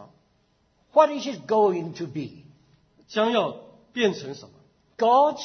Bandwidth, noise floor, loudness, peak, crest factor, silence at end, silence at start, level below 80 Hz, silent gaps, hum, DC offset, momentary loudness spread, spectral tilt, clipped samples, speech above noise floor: 6.6 kHz; -66 dBFS; -24 LUFS; -4 dBFS; 20 dB; 0 s; 0 s; -72 dBFS; none; none; under 0.1%; 17 LU; -5 dB/octave; under 0.1%; 43 dB